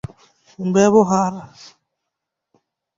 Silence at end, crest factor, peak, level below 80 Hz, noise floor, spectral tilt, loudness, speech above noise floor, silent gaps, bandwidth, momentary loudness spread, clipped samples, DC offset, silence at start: 1.5 s; 18 dB; -2 dBFS; -54 dBFS; -81 dBFS; -6 dB/octave; -17 LUFS; 64 dB; none; 7.8 kHz; 21 LU; under 0.1%; under 0.1%; 0.6 s